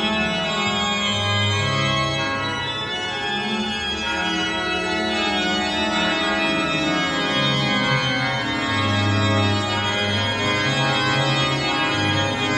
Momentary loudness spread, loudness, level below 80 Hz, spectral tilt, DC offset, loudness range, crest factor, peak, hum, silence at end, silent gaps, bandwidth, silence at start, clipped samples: 4 LU; -20 LUFS; -48 dBFS; -4 dB/octave; under 0.1%; 2 LU; 14 dB; -6 dBFS; none; 0 s; none; 11.5 kHz; 0 s; under 0.1%